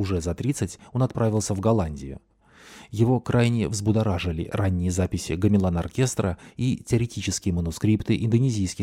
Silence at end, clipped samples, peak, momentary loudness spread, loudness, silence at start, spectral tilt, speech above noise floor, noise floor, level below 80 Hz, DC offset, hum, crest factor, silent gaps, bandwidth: 0 s; under 0.1%; -8 dBFS; 7 LU; -24 LUFS; 0 s; -6.5 dB/octave; 26 dB; -50 dBFS; -42 dBFS; under 0.1%; none; 16 dB; none; 15 kHz